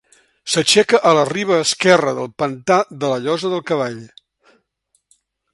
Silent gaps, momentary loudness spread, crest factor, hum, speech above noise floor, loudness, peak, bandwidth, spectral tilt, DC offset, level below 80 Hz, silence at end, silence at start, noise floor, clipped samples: none; 10 LU; 18 dB; none; 50 dB; -16 LUFS; 0 dBFS; 11.5 kHz; -3.5 dB/octave; under 0.1%; -62 dBFS; 1.45 s; 0.45 s; -67 dBFS; under 0.1%